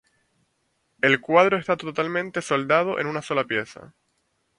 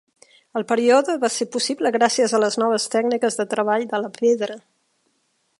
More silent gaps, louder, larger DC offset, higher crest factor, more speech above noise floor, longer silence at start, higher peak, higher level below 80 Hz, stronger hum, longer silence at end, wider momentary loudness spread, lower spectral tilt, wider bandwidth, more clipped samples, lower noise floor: neither; about the same, -22 LUFS vs -20 LUFS; neither; about the same, 22 dB vs 18 dB; about the same, 49 dB vs 48 dB; first, 1.05 s vs 0.55 s; about the same, -2 dBFS vs -2 dBFS; first, -68 dBFS vs -76 dBFS; neither; second, 0.75 s vs 1 s; about the same, 9 LU vs 8 LU; first, -5 dB/octave vs -3 dB/octave; about the same, 11 kHz vs 11.5 kHz; neither; about the same, -71 dBFS vs -68 dBFS